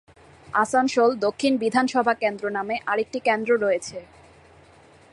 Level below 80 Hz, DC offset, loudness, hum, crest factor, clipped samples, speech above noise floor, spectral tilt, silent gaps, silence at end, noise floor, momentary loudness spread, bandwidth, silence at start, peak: -62 dBFS; under 0.1%; -23 LUFS; none; 18 dB; under 0.1%; 30 dB; -4 dB/octave; none; 1.1 s; -52 dBFS; 7 LU; 11.5 kHz; 0.5 s; -6 dBFS